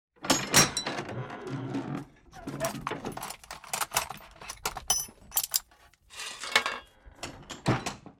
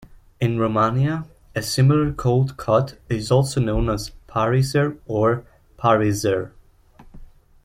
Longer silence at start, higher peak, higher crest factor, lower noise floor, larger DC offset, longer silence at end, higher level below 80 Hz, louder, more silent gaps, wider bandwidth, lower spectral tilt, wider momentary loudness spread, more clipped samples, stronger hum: first, 0.2 s vs 0 s; about the same, -6 dBFS vs -4 dBFS; first, 26 dB vs 18 dB; first, -60 dBFS vs -49 dBFS; neither; second, 0.1 s vs 0.4 s; second, -56 dBFS vs -40 dBFS; second, -30 LUFS vs -21 LUFS; neither; first, 17.5 kHz vs 15 kHz; second, -2 dB/octave vs -6.5 dB/octave; first, 18 LU vs 10 LU; neither; neither